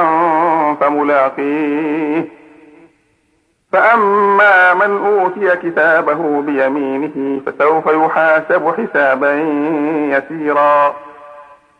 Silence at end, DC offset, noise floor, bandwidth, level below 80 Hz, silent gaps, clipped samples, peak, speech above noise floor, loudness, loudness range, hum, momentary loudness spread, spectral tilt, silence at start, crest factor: 0.35 s; under 0.1%; -60 dBFS; 9.8 kHz; -66 dBFS; none; under 0.1%; 0 dBFS; 47 dB; -13 LUFS; 4 LU; none; 8 LU; -7 dB/octave; 0 s; 14 dB